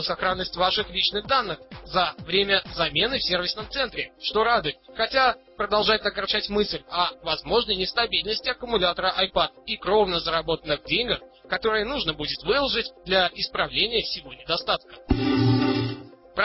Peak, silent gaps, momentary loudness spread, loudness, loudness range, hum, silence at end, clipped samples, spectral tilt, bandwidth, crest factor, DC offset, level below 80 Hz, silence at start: -6 dBFS; none; 7 LU; -24 LUFS; 1 LU; none; 0 s; under 0.1%; -8 dB/octave; 5.8 kHz; 18 dB; under 0.1%; -46 dBFS; 0 s